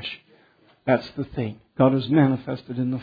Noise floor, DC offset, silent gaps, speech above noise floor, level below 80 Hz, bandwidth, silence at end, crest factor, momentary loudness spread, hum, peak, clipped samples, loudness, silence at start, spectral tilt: -58 dBFS; under 0.1%; none; 36 dB; -56 dBFS; 5 kHz; 0 s; 20 dB; 13 LU; none; -4 dBFS; under 0.1%; -23 LUFS; 0 s; -9.5 dB/octave